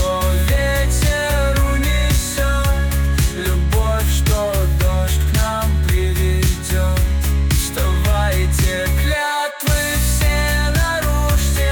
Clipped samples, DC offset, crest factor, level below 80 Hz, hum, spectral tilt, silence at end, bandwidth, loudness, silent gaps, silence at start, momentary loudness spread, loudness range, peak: under 0.1%; under 0.1%; 10 dB; -18 dBFS; none; -4.5 dB/octave; 0 s; 19.5 kHz; -17 LUFS; none; 0 s; 2 LU; 0 LU; -6 dBFS